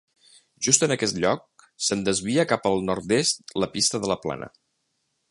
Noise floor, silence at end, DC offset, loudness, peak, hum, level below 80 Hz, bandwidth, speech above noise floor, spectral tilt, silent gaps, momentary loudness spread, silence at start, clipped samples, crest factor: -75 dBFS; 0.8 s; under 0.1%; -23 LUFS; -2 dBFS; none; -58 dBFS; 11.5 kHz; 51 dB; -3 dB/octave; none; 9 LU; 0.6 s; under 0.1%; 24 dB